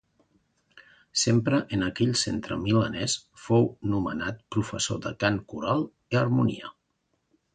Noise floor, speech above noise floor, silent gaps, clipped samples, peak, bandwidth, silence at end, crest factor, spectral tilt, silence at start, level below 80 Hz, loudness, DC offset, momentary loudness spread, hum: -75 dBFS; 49 dB; none; under 0.1%; -10 dBFS; 9.4 kHz; 0.85 s; 18 dB; -5 dB/octave; 1.15 s; -54 dBFS; -27 LUFS; under 0.1%; 7 LU; none